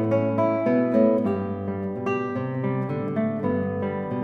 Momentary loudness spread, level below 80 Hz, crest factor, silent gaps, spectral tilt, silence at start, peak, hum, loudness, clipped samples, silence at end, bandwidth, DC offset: 8 LU; -64 dBFS; 16 dB; none; -10 dB/octave; 0 s; -8 dBFS; none; -24 LUFS; under 0.1%; 0 s; 6.2 kHz; under 0.1%